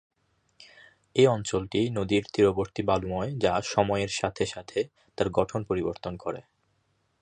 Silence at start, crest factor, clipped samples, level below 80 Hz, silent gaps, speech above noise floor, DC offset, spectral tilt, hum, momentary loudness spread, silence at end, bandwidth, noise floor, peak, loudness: 1.15 s; 20 dB; under 0.1%; -52 dBFS; none; 45 dB; under 0.1%; -5.5 dB/octave; none; 11 LU; 0.8 s; 9.8 kHz; -72 dBFS; -8 dBFS; -27 LUFS